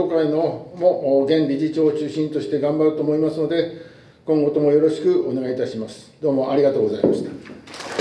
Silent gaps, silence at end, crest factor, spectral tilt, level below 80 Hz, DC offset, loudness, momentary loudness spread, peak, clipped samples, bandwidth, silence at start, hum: none; 0 s; 18 dB; -7.5 dB/octave; -64 dBFS; under 0.1%; -20 LUFS; 13 LU; -2 dBFS; under 0.1%; 10.5 kHz; 0 s; none